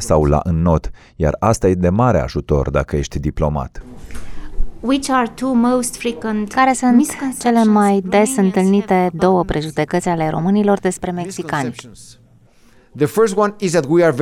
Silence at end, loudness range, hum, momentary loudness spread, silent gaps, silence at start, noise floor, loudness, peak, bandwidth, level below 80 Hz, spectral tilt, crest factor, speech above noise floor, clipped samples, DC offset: 0 s; 5 LU; none; 11 LU; none; 0 s; -49 dBFS; -16 LUFS; -2 dBFS; 15 kHz; -30 dBFS; -6 dB/octave; 14 dB; 33 dB; under 0.1%; under 0.1%